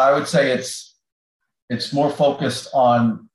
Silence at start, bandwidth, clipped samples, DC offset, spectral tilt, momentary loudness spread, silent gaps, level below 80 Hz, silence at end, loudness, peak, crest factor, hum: 0 s; 12.5 kHz; under 0.1%; under 0.1%; -5 dB/octave; 13 LU; 1.12-1.40 s, 1.62-1.68 s; -64 dBFS; 0.15 s; -19 LUFS; -4 dBFS; 14 dB; none